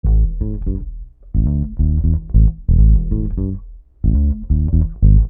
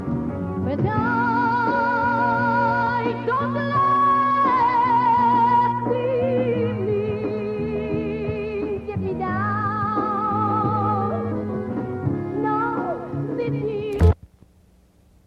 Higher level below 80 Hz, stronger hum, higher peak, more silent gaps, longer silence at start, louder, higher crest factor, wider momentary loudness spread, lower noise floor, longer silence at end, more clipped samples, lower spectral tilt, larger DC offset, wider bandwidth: first, -16 dBFS vs -40 dBFS; neither; first, 0 dBFS vs -6 dBFS; neither; about the same, 0.05 s vs 0 s; first, -18 LUFS vs -22 LUFS; about the same, 14 dB vs 16 dB; about the same, 11 LU vs 9 LU; second, -33 dBFS vs -55 dBFS; second, 0 s vs 1.1 s; neither; first, -16.5 dB/octave vs -9 dB/octave; neither; second, 1.1 kHz vs 8 kHz